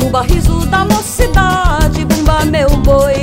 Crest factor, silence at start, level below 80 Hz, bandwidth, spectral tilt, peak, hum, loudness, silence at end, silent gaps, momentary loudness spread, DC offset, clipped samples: 10 dB; 0 s; -14 dBFS; 16.5 kHz; -5.5 dB/octave; 0 dBFS; none; -12 LUFS; 0 s; none; 3 LU; under 0.1%; 0.2%